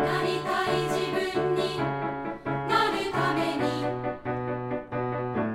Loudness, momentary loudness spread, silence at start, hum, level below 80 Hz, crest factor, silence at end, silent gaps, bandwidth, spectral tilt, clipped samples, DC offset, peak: -28 LUFS; 7 LU; 0 s; none; -56 dBFS; 18 dB; 0 s; none; 16 kHz; -5.5 dB/octave; under 0.1%; under 0.1%; -10 dBFS